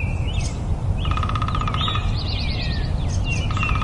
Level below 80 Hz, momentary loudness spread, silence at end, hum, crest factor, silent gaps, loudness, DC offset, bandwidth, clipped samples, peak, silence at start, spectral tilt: -26 dBFS; 3 LU; 0 s; none; 14 dB; none; -23 LUFS; under 0.1%; 11 kHz; under 0.1%; -8 dBFS; 0 s; -5.5 dB/octave